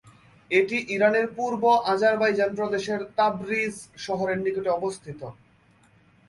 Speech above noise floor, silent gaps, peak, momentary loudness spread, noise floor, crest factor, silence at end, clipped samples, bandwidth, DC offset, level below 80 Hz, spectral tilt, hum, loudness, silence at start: 35 dB; none; -8 dBFS; 11 LU; -59 dBFS; 18 dB; 0.95 s; under 0.1%; 11.5 kHz; under 0.1%; -64 dBFS; -5 dB/octave; none; -24 LUFS; 0.05 s